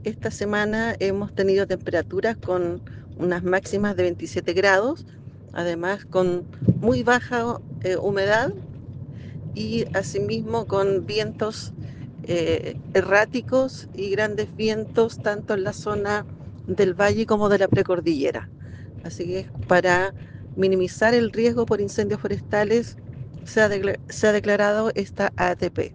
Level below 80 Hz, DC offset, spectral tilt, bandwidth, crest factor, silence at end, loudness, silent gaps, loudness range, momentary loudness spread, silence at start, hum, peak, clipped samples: -50 dBFS; under 0.1%; -6 dB/octave; 9.8 kHz; 20 dB; 0 s; -23 LUFS; none; 3 LU; 16 LU; 0 s; none; -4 dBFS; under 0.1%